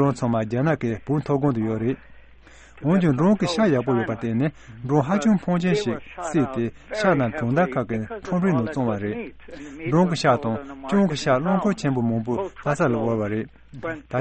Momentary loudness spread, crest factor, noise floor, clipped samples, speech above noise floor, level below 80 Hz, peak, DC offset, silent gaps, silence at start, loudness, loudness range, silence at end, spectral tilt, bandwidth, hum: 10 LU; 18 dB; -48 dBFS; under 0.1%; 25 dB; -50 dBFS; -4 dBFS; under 0.1%; none; 0 s; -23 LUFS; 2 LU; 0 s; -7 dB/octave; 8.4 kHz; none